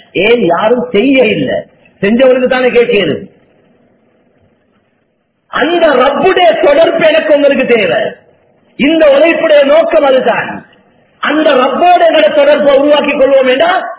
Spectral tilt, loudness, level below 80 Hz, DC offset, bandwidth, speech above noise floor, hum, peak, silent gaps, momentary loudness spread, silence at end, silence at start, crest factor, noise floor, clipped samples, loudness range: -8.5 dB/octave; -8 LUFS; -46 dBFS; under 0.1%; 4 kHz; 51 dB; none; 0 dBFS; none; 8 LU; 0.05 s; 0.15 s; 10 dB; -59 dBFS; 1%; 5 LU